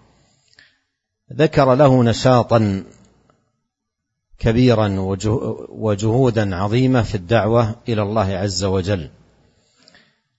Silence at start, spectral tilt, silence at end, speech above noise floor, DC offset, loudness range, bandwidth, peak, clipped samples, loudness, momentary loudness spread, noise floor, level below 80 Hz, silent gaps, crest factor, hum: 1.3 s; -7 dB/octave; 1.3 s; 62 dB; under 0.1%; 3 LU; 8 kHz; -2 dBFS; under 0.1%; -17 LUFS; 10 LU; -78 dBFS; -42 dBFS; none; 16 dB; none